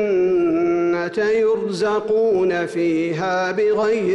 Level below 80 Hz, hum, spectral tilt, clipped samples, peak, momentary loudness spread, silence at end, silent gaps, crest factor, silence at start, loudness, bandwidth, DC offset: -56 dBFS; none; -6 dB/octave; under 0.1%; -12 dBFS; 3 LU; 0 s; none; 8 dB; 0 s; -19 LUFS; 11 kHz; under 0.1%